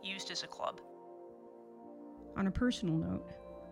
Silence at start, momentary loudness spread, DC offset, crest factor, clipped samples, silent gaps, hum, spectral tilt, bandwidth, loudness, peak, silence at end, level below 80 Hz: 0 s; 20 LU; under 0.1%; 18 dB; under 0.1%; none; none; -5.5 dB/octave; 12 kHz; -37 LUFS; -22 dBFS; 0 s; -56 dBFS